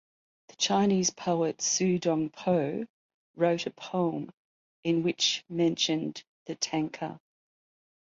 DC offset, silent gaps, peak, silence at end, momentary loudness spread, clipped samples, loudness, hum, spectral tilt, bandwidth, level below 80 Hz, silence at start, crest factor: under 0.1%; 2.90-3.34 s, 4.37-4.83 s, 6.27-6.46 s; -12 dBFS; 0.85 s; 13 LU; under 0.1%; -29 LUFS; none; -4 dB/octave; 7.8 kHz; -72 dBFS; 0.6 s; 18 dB